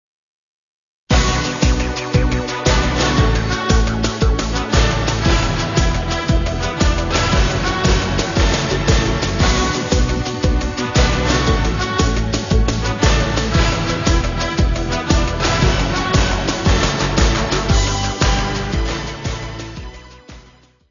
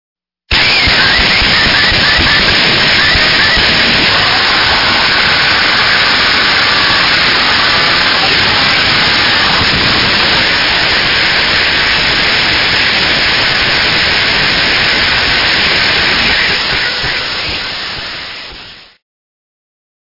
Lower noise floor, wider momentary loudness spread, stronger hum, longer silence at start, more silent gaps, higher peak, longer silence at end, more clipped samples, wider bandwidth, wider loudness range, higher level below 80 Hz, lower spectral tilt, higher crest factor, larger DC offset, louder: first, -48 dBFS vs -32 dBFS; about the same, 4 LU vs 5 LU; neither; first, 1.1 s vs 0.5 s; neither; about the same, 0 dBFS vs 0 dBFS; second, 0.5 s vs 1.25 s; second, under 0.1% vs 0.1%; first, 7.4 kHz vs 6 kHz; second, 1 LU vs 4 LU; first, -20 dBFS vs -30 dBFS; first, -4.5 dB/octave vs -3 dB/octave; first, 16 dB vs 10 dB; neither; second, -17 LUFS vs -7 LUFS